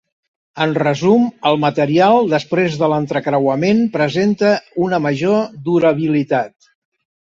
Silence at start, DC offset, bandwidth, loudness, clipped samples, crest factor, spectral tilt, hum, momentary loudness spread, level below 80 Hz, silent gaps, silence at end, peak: 0.55 s; under 0.1%; 7.8 kHz; -16 LUFS; under 0.1%; 14 dB; -7 dB/octave; none; 5 LU; -58 dBFS; none; 0.75 s; -2 dBFS